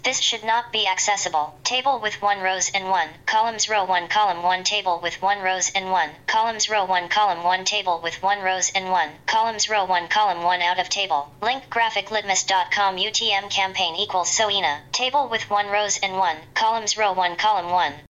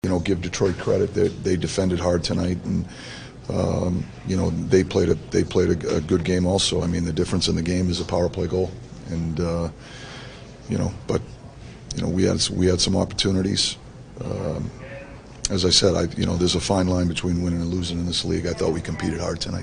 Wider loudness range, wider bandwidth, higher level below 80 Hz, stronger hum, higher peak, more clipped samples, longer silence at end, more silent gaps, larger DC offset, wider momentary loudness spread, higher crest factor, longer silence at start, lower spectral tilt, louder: second, 1 LU vs 5 LU; second, 8.4 kHz vs 10 kHz; second, -62 dBFS vs -40 dBFS; neither; second, -10 dBFS vs -4 dBFS; neither; about the same, 0.1 s vs 0 s; neither; neither; second, 3 LU vs 16 LU; second, 12 dB vs 20 dB; about the same, 0.05 s vs 0.05 s; second, 0 dB/octave vs -5 dB/octave; about the same, -21 LUFS vs -23 LUFS